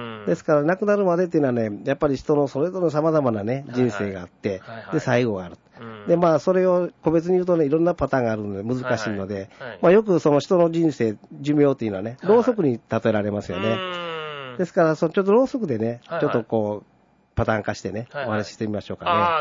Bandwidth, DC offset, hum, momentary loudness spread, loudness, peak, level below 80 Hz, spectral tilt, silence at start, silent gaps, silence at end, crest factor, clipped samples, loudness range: 7.6 kHz; under 0.1%; none; 11 LU; -22 LUFS; -6 dBFS; -52 dBFS; -7 dB/octave; 0 s; none; 0 s; 16 dB; under 0.1%; 3 LU